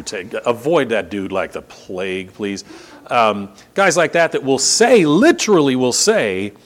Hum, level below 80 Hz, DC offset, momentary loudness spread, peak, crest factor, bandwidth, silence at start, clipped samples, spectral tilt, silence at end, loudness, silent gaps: none; -58 dBFS; under 0.1%; 14 LU; 0 dBFS; 16 dB; 17 kHz; 0 s; under 0.1%; -3.5 dB/octave; 0.15 s; -16 LUFS; none